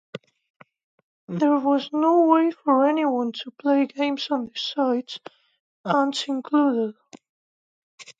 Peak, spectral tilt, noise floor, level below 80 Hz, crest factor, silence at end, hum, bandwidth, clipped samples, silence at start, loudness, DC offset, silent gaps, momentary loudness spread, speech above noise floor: -6 dBFS; -5.5 dB/octave; under -90 dBFS; -80 dBFS; 18 dB; 0.1 s; none; 7.8 kHz; under 0.1%; 0.15 s; -22 LUFS; under 0.1%; 0.50-0.60 s, 0.84-1.28 s, 5.60-5.84 s, 7.29-7.98 s; 13 LU; over 68 dB